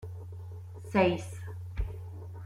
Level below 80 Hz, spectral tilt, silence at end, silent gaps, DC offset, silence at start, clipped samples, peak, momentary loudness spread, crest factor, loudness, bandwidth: -44 dBFS; -7 dB/octave; 0 s; none; under 0.1%; 0 s; under 0.1%; -12 dBFS; 17 LU; 22 dB; -32 LUFS; 14.5 kHz